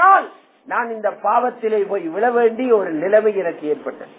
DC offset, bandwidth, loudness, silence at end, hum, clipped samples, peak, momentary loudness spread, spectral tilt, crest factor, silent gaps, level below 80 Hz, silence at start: under 0.1%; 4 kHz; -18 LUFS; 0.1 s; none; under 0.1%; -2 dBFS; 8 LU; -9 dB/octave; 16 dB; none; -76 dBFS; 0 s